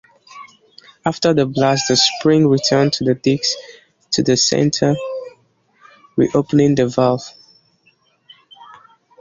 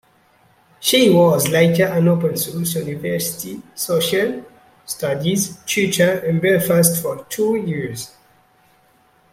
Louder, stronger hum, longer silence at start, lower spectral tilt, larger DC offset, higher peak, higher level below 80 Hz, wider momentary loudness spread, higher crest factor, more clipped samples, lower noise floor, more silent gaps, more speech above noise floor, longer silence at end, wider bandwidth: about the same, -16 LUFS vs -18 LUFS; neither; second, 0.35 s vs 0.8 s; about the same, -4.5 dB/octave vs -4.5 dB/octave; neither; about the same, -2 dBFS vs 0 dBFS; about the same, -54 dBFS vs -58 dBFS; about the same, 11 LU vs 12 LU; about the same, 16 dB vs 18 dB; neither; about the same, -59 dBFS vs -56 dBFS; neither; first, 43 dB vs 38 dB; second, 0.55 s vs 1.25 s; second, 7.8 kHz vs 16.5 kHz